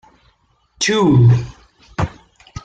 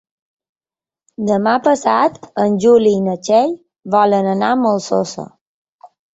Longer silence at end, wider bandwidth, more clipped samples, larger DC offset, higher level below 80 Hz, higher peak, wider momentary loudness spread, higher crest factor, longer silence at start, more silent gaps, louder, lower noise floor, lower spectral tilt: second, 0.05 s vs 0.25 s; first, 9 kHz vs 8 kHz; neither; neither; first, -40 dBFS vs -60 dBFS; about the same, -2 dBFS vs -2 dBFS; first, 21 LU vs 11 LU; about the same, 14 dB vs 14 dB; second, 0.8 s vs 1.2 s; second, none vs 5.41-5.79 s; about the same, -15 LUFS vs -15 LUFS; second, -59 dBFS vs under -90 dBFS; about the same, -6 dB/octave vs -6 dB/octave